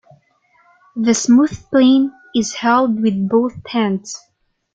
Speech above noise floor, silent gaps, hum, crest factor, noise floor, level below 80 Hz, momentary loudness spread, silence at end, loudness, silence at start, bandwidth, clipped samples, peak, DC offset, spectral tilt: 42 dB; none; none; 14 dB; -57 dBFS; -54 dBFS; 10 LU; 0.55 s; -16 LUFS; 0.95 s; 9.2 kHz; under 0.1%; -2 dBFS; under 0.1%; -4.5 dB/octave